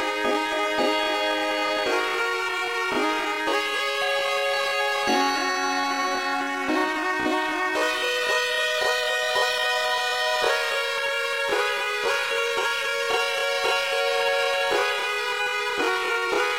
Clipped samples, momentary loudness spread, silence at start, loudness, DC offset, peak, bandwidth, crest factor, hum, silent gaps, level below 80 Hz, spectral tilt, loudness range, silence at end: under 0.1%; 2 LU; 0 s; -23 LUFS; 0.1%; -10 dBFS; 16.5 kHz; 14 dB; none; none; -64 dBFS; -1 dB/octave; 1 LU; 0 s